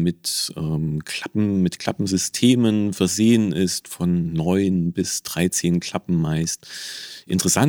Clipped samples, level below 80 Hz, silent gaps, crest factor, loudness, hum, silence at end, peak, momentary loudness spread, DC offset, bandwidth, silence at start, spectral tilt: under 0.1%; -50 dBFS; none; 18 dB; -21 LUFS; none; 0 s; -2 dBFS; 9 LU; under 0.1%; 18 kHz; 0 s; -5 dB/octave